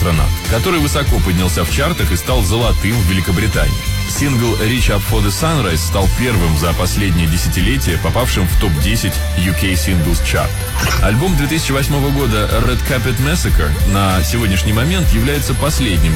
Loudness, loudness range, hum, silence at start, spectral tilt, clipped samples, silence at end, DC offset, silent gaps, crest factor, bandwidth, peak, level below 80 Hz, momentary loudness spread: -15 LUFS; 1 LU; none; 0 s; -5 dB/octave; under 0.1%; 0 s; under 0.1%; none; 12 dB; 16.5 kHz; -2 dBFS; -18 dBFS; 2 LU